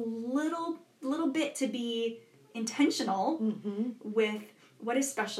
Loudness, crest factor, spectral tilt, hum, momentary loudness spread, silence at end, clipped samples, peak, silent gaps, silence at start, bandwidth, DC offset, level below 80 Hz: -32 LUFS; 18 dB; -3.5 dB/octave; none; 10 LU; 0 s; under 0.1%; -16 dBFS; none; 0 s; 14.5 kHz; under 0.1%; under -90 dBFS